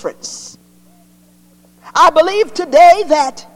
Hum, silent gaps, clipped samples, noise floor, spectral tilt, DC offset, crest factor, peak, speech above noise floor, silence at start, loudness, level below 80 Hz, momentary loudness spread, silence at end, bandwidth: 60 Hz at -50 dBFS; none; under 0.1%; -48 dBFS; -2 dB/octave; under 0.1%; 14 dB; 0 dBFS; 37 dB; 0.05 s; -11 LUFS; -52 dBFS; 20 LU; 0.15 s; 14.5 kHz